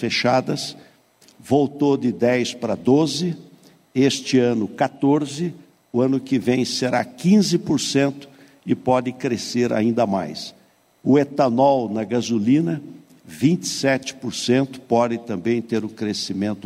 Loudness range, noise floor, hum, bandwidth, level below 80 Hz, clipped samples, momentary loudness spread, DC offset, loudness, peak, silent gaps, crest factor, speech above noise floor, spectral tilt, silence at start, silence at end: 2 LU; -54 dBFS; none; 14.5 kHz; -62 dBFS; under 0.1%; 9 LU; under 0.1%; -21 LUFS; -6 dBFS; none; 16 dB; 34 dB; -5.5 dB/octave; 0 s; 0 s